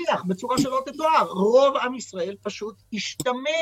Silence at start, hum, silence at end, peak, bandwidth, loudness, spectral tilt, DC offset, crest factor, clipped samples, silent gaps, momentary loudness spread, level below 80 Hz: 0 s; none; 0 s; -6 dBFS; 16.5 kHz; -23 LUFS; -4.5 dB/octave; under 0.1%; 18 dB; under 0.1%; none; 14 LU; -62 dBFS